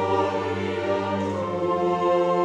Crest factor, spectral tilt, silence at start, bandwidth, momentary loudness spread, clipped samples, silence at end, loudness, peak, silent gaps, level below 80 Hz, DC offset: 14 dB; -7 dB/octave; 0 s; 9.4 kHz; 5 LU; under 0.1%; 0 s; -24 LUFS; -8 dBFS; none; -64 dBFS; under 0.1%